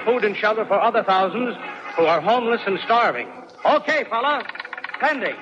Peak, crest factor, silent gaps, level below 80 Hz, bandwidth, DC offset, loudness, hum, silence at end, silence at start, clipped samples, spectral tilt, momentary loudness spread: -6 dBFS; 14 dB; none; -76 dBFS; 7.8 kHz; under 0.1%; -20 LUFS; none; 0 s; 0 s; under 0.1%; -5 dB/octave; 11 LU